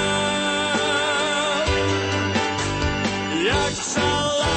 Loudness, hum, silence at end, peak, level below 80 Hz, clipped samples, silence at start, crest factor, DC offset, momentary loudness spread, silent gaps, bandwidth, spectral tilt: -21 LUFS; none; 0 s; -8 dBFS; -38 dBFS; under 0.1%; 0 s; 14 dB; under 0.1%; 3 LU; none; 8.8 kHz; -3.5 dB/octave